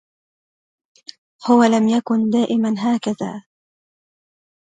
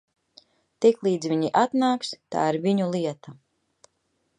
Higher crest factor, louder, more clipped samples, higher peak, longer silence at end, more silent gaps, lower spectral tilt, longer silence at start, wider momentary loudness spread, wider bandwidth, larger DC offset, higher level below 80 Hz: about the same, 20 dB vs 20 dB; first, -18 LUFS vs -24 LUFS; neither; first, -2 dBFS vs -6 dBFS; first, 1.3 s vs 1.05 s; neither; about the same, -6 dB/octave vs -6 dB/octave; first, 1.4 s vs 0.8 s; first, 14 LU vs 8 LU; second, 9.2 kHz vs 11 kHz; neither; first, -66 dBFS vs -74 dBFS